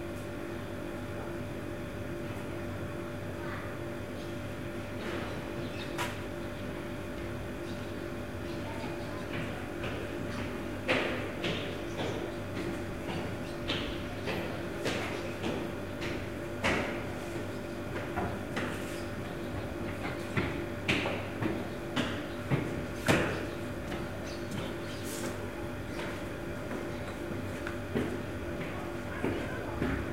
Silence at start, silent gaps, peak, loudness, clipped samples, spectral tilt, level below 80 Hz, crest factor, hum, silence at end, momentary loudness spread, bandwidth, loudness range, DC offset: 0 s; none; -12 dBFS; -36 LUFS; under 0.1%; -5.5 dB/octave; -50 dBFS; 24 dB; none; 0 s; 7 LU; 16 kHz; 5 LU; 0.3%